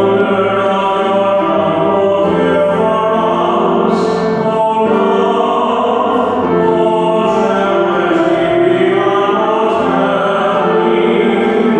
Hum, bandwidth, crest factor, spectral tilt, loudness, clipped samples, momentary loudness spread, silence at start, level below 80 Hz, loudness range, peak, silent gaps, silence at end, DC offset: none; 9 kHz; 12 dB; -7 dB/octave; -12 LUFS; under 0.1%; 1 LU; 0 s; -48 dBFS; 1 LU; 0 dBFS; none; 0 s; under 0.1%